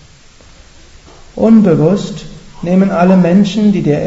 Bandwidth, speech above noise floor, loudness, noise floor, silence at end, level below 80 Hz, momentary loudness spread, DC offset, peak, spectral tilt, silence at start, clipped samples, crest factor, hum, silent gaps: 8 kHz; 31 dB; -10 LUFS; -40 dBFS; 0 s; -40 dBFS; 16 LU; under 0.1%; 0 dBFS; -8 dB/octave; 1.35 s; 0.2%; 12 dB; none; none